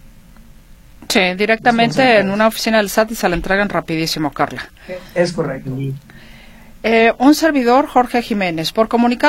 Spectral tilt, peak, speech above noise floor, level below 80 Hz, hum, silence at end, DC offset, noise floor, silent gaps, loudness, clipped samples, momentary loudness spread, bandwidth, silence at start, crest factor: -4.5 dB/octave; 0 dBFS; 26 dB; -40 dBFS; none; 0 s; under 0.1%; -41 dBFS; none; -15 LUFS; under 0.1%; 12 LU; 16.5 kHz; 0.05 s; 16 dB